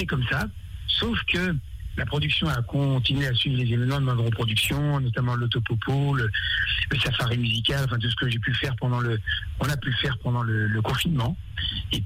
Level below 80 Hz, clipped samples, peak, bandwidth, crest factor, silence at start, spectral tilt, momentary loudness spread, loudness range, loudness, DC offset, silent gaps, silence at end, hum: -40 dBFS; under 0.1%; -14 dBFS; 16 kHz; 12 dB; 0 s; -5.5 dB/octave; 5 LU; 2 LU; -25 LUFS; under 0.1%; none; 0 s; none